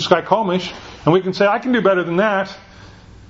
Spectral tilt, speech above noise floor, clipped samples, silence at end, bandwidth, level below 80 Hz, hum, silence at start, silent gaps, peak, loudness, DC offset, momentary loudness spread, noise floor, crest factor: -6 dB/octave; 24 dB; under 0.1%; 0.1 s; 7.8 kHz; -50 dBFS; none; 0 s; none; 0 dBFS; -17 LUFS; under 0.1%; 10 LU; -41 dBFS; 18 dB